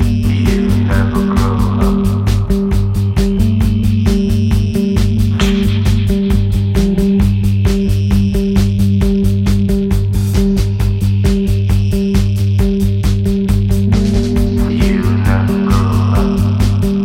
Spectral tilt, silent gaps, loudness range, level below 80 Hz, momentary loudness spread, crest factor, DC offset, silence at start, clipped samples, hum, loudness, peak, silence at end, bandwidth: -7.5 dB/octave; none; 1 LU; -18 dBFS; 2 LU; 12 dB; under 0.1%; 0 s; under 0.1%; none; -13 LUFS; 0 dBFS; 0 s; 16 kHz